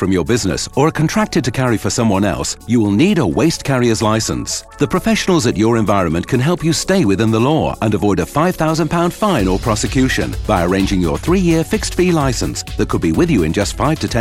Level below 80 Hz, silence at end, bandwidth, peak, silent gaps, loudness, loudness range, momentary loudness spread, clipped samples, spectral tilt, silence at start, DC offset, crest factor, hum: -30 dBFS; 0 s; 16 kHz; 0 dBFS; none; -15 LUFS; 1 LU; 4 LU; under 0.1%; -5.5 dB/octave; 0 s; under 0.1%; 14 dB; none